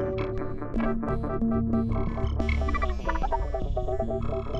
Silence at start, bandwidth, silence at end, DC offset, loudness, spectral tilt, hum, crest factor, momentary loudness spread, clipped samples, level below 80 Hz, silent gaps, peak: 0 s; 7.4 kHz; 0 s; under 0.1%; -29 LUFS; -8.5 dB/octave; none; 14 dB; 4 LU; under 0.1%; -32 dBFS; none; -12 dBFS